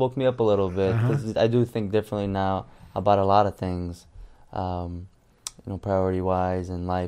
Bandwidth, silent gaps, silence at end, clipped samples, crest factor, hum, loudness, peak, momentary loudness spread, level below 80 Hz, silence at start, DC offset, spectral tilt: 14.5 kHz; none; 0 s; under 0.1%; 20 dB; none; -25 LUFS; -4 dBFS; 15 LU; -50 dBFS; 0 s; under 0.1%; -7 dB/octave